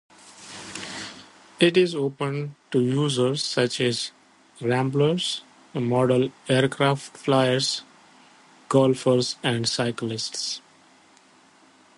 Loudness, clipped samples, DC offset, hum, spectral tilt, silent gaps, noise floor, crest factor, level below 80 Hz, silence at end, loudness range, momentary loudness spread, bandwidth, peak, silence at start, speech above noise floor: -24 LUFS; under 0.1%; under 0.1%; none; -5 dB/octave; none; -56 dBFS; 20 dB; -66 dBFS; 1.4 s; 2 LU; 14 LU; 11.5 kHz; -6 dBFS; 0.25 s; 33 dB